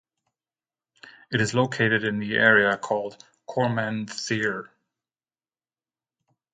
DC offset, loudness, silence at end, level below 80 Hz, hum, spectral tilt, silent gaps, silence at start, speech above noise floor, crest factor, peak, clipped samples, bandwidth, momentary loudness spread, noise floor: under 0.1%; -23 LUFS; 1.85 s; -64 dBFS; none; -5 dB/octave; none; 1.05 s; over 66 dB; 22 dB; -4 dBFS; under 0.1%; 9.4 kHz; 12 LU; under -90 dBFS